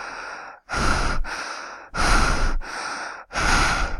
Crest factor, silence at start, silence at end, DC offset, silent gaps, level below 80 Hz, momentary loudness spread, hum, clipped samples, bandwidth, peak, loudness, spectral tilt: 16 dB; 0 s; 0 s; under 0.1%; none; -26 dBFS; 14 LU; none; under 0.1%; 12.5 kHz; -6 dBFS; -24 LUFS; -3 dB/octave